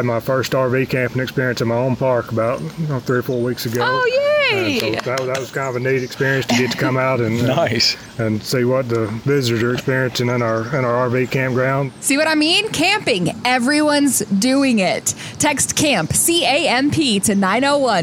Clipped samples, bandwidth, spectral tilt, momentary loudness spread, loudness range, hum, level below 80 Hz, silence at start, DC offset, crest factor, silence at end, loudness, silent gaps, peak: under 0.1%; over 20 kHz; -4 dB/octave; 6 LU; 3 LU; none; -50 dBFS; 0 s; under 0.1%; 14 dB; 0 s; -17 LUFS; none; -4 dBFS